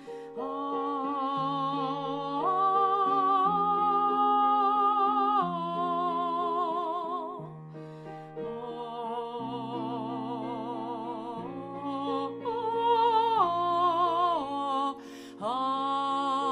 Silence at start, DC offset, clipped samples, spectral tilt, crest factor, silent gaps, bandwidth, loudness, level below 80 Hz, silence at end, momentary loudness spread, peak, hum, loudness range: 0 s; under 0.1%; under 0.1%; -6.5 dB/octave; 16 dB; none; 10.5 kHz; -29 LUFS; -74 dBFS; 0 s; 13 LU; -14 dBFS; none; 10 LU